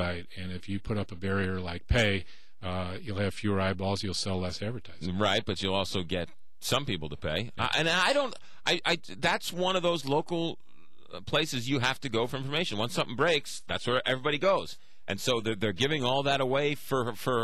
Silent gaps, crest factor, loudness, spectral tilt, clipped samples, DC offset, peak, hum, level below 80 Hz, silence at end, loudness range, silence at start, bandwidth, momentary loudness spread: none; 16 dB; -30 LUFS; -4.5 dB/octave; under 0.1%; 1%; -14 dBFS; none; -50 dBFS; 0 s; 3 LU; 0 s; 15.5 kHz; 10 LU